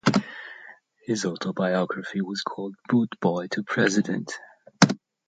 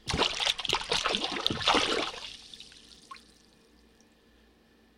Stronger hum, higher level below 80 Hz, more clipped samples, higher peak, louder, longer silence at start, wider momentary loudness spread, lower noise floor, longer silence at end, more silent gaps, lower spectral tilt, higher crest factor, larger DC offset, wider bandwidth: neither; second, -68 dBFS vs -52 dBFS; neither; first, -2 dBFS vs -6 dBFS; first, -25 LUFS vs -28 LUFS; about the same, 0.05 s vs 0.05 s; second, 17 LU vs 24 LU; second, -49 dBFS vs -62 dBFS; second, 0.3 s vs 1.8 s; neither; first, -5 dB/octave vs -2 dB/octave; about the same, 24 dB vs 26 dB; neither; second, 9.2 kHz vs 16 kHz